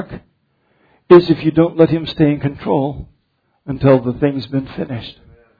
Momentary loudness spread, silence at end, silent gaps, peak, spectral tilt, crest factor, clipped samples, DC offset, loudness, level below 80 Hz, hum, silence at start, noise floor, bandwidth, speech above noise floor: 18 LU; 0.5 s; none; 0 dBFS; -10 dB/octave; 16 dB; 0.2%; under 0.1%; -15 LUFS; -44 dBFS; none; 0 s; -64 dBFS; 5 kHz; 50 dB